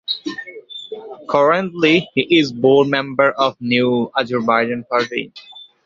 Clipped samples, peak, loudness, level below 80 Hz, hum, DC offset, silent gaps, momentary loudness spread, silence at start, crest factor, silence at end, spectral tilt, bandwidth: under 0.1%; 0 dBFS; -16 LUFS; -60 dBFS; none; under 0.1%; none; 18 LU; 0.1 s; 16 dB; 0.2 s; -6 dB/octave; 7.6 kHz